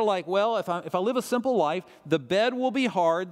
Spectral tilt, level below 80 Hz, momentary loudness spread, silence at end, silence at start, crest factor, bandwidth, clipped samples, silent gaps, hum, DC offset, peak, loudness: -5 dB/octave; -74 dBFS; 5 LU; 0 s; 0 s; 16 dB; 15.5 kHz; under 0.1%; none; none; under 0.1%; -10 dBFS; -26 LUFS